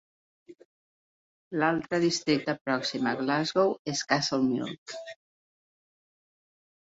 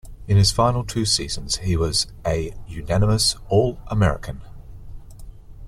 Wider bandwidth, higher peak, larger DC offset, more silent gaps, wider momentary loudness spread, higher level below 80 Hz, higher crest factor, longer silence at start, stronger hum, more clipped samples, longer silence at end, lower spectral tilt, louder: second, 8 kHz vs 14 kHz; second, -8 dBFS vs -4 dBFS; neither; first, 0.65-1.51 s, 2.61-2.65 s, 3.79-3.85 s, 4.78-4.86 s vs none; about the same, 12 LU vs 13 LU; second, -70 dBFS vs -34 dBFS; about the same, 22 dB vs 18 dB; first, 0.5 s vs 0.05 s; neither; neither; first, 1.8 s vs 0 s; about the same, -4 dB/octave vs -4.5 dB/octave; second, -28 LUFS vs -21 LUFS